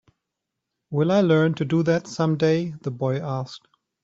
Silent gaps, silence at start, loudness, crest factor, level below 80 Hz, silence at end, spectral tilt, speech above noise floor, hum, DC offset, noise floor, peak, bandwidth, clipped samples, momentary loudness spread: none; 0.9 s; -23 LUFS; 16 dB; -62 dBFS; 0.45 s; -7.5 dB/octave; 61 dB; none; under 0.1%; -83 dBFS; -6 dBFS; 7.8 kHz; under 0.1%; 11 LU